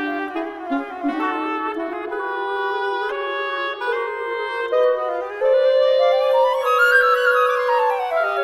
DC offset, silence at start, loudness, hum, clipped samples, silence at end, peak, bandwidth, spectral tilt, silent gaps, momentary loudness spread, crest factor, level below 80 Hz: under 0.1%; 0 s; -20 LUFS; none; under 0.1%; 0 s; -4 dBFS; 14.5 kHz; -2.5 dB/octave; none; 10 LU; 16 dB; -64 dBFS